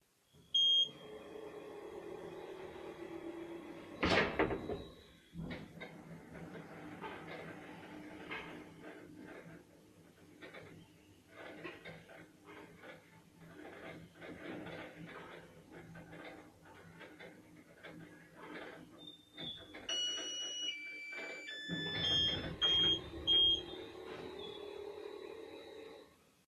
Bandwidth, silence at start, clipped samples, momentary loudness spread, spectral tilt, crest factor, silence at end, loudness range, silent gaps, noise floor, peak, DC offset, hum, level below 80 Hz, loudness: 13 kHz; 0.35 s; under 0.1%; 24 LU; -3 dB/octave; 24 dB; 0.3 s; 21 LU; none; -68 dBFS; -18 dBFS; under 0.1%; none; -64 dBFS; -36 LUFS